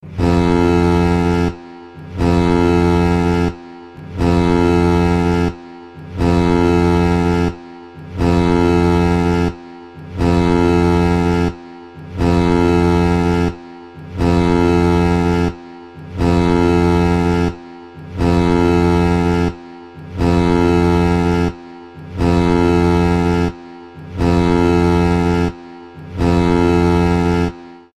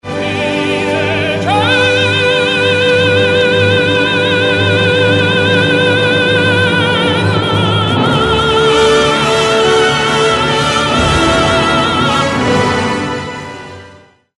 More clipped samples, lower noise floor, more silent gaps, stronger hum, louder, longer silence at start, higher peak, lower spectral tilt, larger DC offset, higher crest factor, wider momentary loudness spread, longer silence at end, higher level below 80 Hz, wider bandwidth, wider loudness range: neither; second, -35 dBFS vs -41 dBFS; neither; neither; second, -15 LUFS vs -11 LUFS; about the same, 0.05 s vs 0.05 s; about the same, 0 dBFS vs 0 dBFS; first, -7.5 dB/octave vs -4.5 dB/octave; first, 0.6% vs under 0.1%; about the same, 14 dB vs 12 dB; first, 21 LU vs 5 LU; second, 0.2 s vs 0.5 s; first, -28 dBFS vs -34 dBFS; about the same, 11 kHz vs 11.5 kHz; about the same, 2 LU vs 1 LU